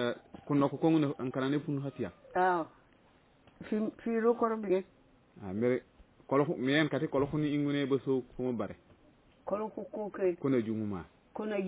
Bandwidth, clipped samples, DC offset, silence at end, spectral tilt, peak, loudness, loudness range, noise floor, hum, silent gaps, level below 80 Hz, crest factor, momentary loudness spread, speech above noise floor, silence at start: 4 kHz; under 0.1%; under 0.1%; 0 s; -6 dB/octave; -14 dBFS; -33 LUFS; 3 LU; -65 dBFS; none; none; -66 dBFS; 18 dB; 12 LU; 33 dB; 0 s